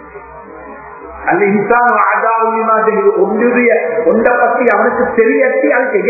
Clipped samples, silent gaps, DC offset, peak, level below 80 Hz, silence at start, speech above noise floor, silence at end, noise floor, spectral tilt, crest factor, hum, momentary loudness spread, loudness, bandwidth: under 0.1%; none; under 0.1%; 0 dBFS; -48 dBFS; 0 s; 21 dB; 0 s; -32 dBFS; -10.5 dB/octave; 12 dB; none; 20 LU; -11 LUFS; 2.7 kHz